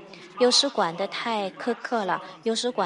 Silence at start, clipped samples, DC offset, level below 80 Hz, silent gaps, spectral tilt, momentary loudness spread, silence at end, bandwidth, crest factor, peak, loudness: 0 s; under 0.1%; under 0.1%; -80 dBFS; none; -2.5 dB/octave; 10 LU; 0 s; 11.5 kHz; 18 dB; -8 dBFS; -25 LUFS